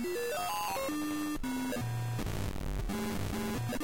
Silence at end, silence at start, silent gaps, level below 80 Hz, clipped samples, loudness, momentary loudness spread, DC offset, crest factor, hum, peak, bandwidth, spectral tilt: 0 s; 0 s; none; -44 dBFS; under 0.1%; -36 LUFS; 3 LU; 0.4%; 8 dB; none; -26 dBFS; 17 kHz; -5 dB/octave